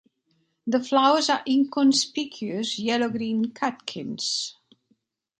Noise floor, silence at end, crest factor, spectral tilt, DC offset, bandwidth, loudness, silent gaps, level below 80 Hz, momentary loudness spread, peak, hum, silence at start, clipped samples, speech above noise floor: -70 dBFS; 0.9 s; 20 dB; -3 dB/octave; under 0.1%; 9.4 kHz; -24 LUFS; none; -74 dBFS; 11 LU; -6 dBFS; none; 0.65 s; under 0.1%; 47 dB